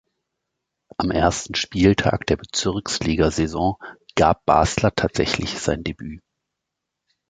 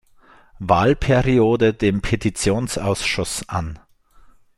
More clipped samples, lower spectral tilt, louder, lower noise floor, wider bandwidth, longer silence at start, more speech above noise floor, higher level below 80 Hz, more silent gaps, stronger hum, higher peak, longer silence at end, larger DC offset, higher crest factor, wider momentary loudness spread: neither; about the same, -5 dB/octave vs -5.5 dB/octave; about the same, -21 LUFS vs -19 LUFS; first, -82 dBFS vs -51 dBFS; second, 9.6 kHz vs 13 kHz; first, 1 s vs 0.6 s; first, 62 dB vs 32 dB; about the same, -38 dBFS vs -36 dBFS; neither; neither; about the same, 0 dBFS vs -2 dBFS; first, 1.1 s vs 0.8 s; neither; about the same, 22 dB vs 18 dB; about the same, 10 LU vs 10 LU